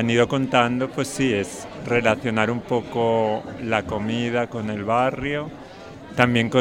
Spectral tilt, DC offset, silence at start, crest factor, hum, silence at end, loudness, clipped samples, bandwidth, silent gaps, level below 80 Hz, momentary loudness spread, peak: -5.5 dB/octave; under 0.1%; 0 s; 22 dB; none; 0 s; -22 LUFS; under 0.1%; 16.5 kHz; none; -50 dBFS; 11 LU; 0 dBFS